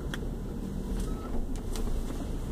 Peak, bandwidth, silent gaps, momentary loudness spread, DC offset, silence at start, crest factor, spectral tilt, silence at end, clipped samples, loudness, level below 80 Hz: -18 dBFS; 15.5 kHz; none; 2 LU; under 0.1%; 0 s; 14 dB; -6 dB/octave; 0 s; under 0.1%; -37 LUFS; -34 dBFS